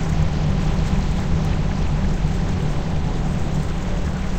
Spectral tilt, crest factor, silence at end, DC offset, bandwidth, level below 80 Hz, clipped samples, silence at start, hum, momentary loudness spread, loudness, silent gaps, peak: -7 dB/octave; 14 dB; 0 s; 1%; 8.8 kHz; -24 dBFS; under 0.1%; 0 s; none; 3 LU; -23 LUFS; none; -6 dBFS